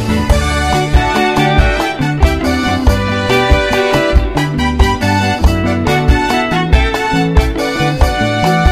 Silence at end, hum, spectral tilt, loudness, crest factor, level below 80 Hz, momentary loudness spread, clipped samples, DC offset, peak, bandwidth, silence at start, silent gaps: 0 s; none; -5.5 dB/octave; -13 LUFS; 12 dB; -16 dBFS; 3 LU; 0.3%; under 0.1%; 0 dBFS; 15.5 kHz; 0 s; none